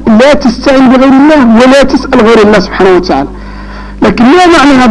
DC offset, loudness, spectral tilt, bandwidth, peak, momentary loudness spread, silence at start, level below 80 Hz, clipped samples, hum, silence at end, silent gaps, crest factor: under 0.1%; -4 LUFS; -5.5 dB/octave; 11.5 kHz; 0 dBFS; 13 LU; 0 s; -26 dBFS; 2%; none; 0 s; none; 4 dB